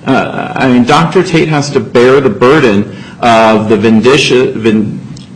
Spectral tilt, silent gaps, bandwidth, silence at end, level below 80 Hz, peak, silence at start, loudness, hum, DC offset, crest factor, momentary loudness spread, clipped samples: -5.5 dB/octave; none; 11 kHz; 0 s; -40 dBFS; 0 dBFS; 0.05 s; -8 LUFS; none; under 0.1%; 8 dB; 7 LU; 0.1%